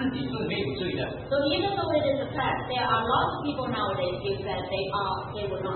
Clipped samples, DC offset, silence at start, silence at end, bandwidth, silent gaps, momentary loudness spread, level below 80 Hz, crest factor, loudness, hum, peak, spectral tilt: under 0.1%; under 0.1%; 0 s; 0 s; 4.5 kHz; none; 6 LU; -50 dBFS; 16 dB; -28 LUFS; none; -12 dBFS; -10 dB/octave